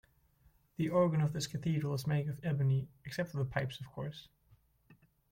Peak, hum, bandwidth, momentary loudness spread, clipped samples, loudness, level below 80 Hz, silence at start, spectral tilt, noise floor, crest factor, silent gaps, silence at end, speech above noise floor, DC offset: -18 dBFS; none; 16.5 kHz; 13 LU; under 0.1%; -35 LUFS; -64 dBFS; 0.8 s; -6.5 dB/octave; -69 dBFS; 18 dB; none; 0.4 s; 34 dB; under 0.1%